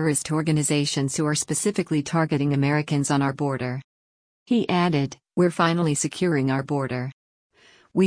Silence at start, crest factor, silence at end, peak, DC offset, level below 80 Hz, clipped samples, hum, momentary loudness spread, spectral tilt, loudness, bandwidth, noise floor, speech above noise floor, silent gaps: 0 s; 16 dB; 0 s; -8 dBFS; under 0.1%; -60 dBFS; under 0.1%; none; 7 LU; -5 dB/octave; -23 LUFS; 10.5 kHz; under -90 dBFS; over 67 dB; 3.84-4.46 s, 7.13-7.50 s